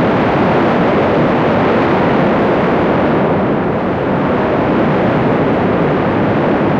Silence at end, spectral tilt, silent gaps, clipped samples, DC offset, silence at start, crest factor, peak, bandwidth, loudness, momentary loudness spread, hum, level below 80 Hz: 0 s; -8.5 dB/octave; none; under 0.1%; under 0.1%; 0 s; 10 dB; -4 dBFS; 7.6 kHz; -13 LUFS; 2 LU; none; -36 dBFS